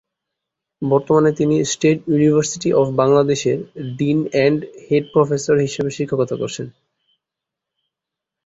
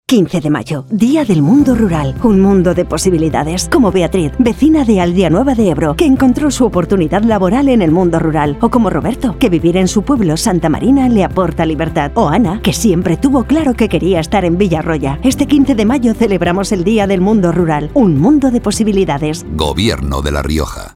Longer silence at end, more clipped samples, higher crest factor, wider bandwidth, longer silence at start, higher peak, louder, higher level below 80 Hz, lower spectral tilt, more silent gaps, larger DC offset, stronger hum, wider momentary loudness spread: first, 1.75 s vs 0.05 s; neither; about the same, 16 dB vs 12 dB; second, 8 kHz vs 15.5 kHz; first, 0.8 s vs 0.1 s; about the same, -2 dBFS vs 0 dBFS; second, -18 LUFS vs -12 LUFS; second, -56 dBFS vs -26 dBFS; about the same, -6 dB/octave vs -6 dB/octave; neither; neither; neither; first, 10 LU vs 5 LU